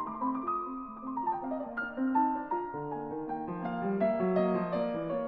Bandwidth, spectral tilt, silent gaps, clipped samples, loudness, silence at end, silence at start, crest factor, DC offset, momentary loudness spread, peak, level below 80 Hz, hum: 5.2 kHz; -10.5 dB/octave; none; under 0.1%; -33 LUFS; 0 s; 0 s; 16 dB; under 0.1%; 9 LU; -16 dBFS; -64 dBFS; none